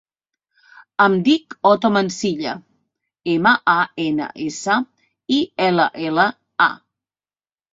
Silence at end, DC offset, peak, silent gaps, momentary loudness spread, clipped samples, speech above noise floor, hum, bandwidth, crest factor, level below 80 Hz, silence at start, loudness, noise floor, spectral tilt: 0.95 s; under 0.1%; -2 dBFS; none; 13 LU; under 0.1%; over 72 dB; none; 8 kHz; 18 dB; -64 dBFS; 1 s; -18 LUFS; under -90 dBFS; -4.5 dB/octave